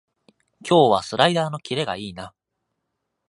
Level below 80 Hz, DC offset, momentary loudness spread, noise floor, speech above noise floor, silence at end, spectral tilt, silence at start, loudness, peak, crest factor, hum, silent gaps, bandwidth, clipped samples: -60 dBFS; under 0.1%; 21 LU; -78 dBFS; 58 dB; 1 s; -5 dB/octave; 0.65 s; -20 LUFS; -2 dBFS; 22 dB; none; none; 11.5 kHz; under 0.1%